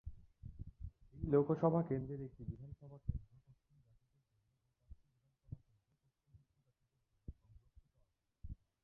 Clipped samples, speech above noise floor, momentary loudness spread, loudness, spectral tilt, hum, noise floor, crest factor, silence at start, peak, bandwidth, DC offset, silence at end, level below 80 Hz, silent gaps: under 0.1%; 45 dB; 24 LU; -39 LUFS; -11.5 dB/octave; none; -82 dBFS; 26 dB; 0.05 s; -20 dBFS; 3.7 kHz; under 0.1%; 0.3 s; -58 dBFS; none